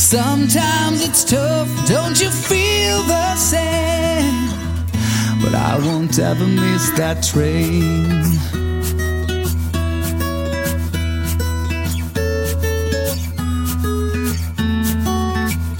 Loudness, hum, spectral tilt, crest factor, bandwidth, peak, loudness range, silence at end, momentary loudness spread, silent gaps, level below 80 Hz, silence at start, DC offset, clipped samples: -17 LUFS; none; -4.5 dB/octave; 16 dB; 17 kHz; -2 dBFS; 5 LU; 0 s; 6 LU; none; -26 dBFS; 0 s; under 0.1%; under 0.1%